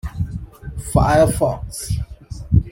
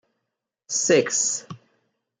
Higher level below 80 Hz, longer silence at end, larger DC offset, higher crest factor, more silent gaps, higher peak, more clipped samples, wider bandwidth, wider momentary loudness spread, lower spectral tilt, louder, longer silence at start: first, -28 dBFS vs -72 dBFS; second, 0 s vs 0.65 s; neither; about the same, 16 dB vs 20 dB; neither; first, -2 dBFS vs -6 dBFS; neither; first, 16.5 kHz vs 10 kHz; first, 18 LU vs 9 LU; first, -6.5 dB/octave vs -2 dB/octave; about the same, -19 LUFS vs -21 LUFS; second, 0.05 s vs 0.7 s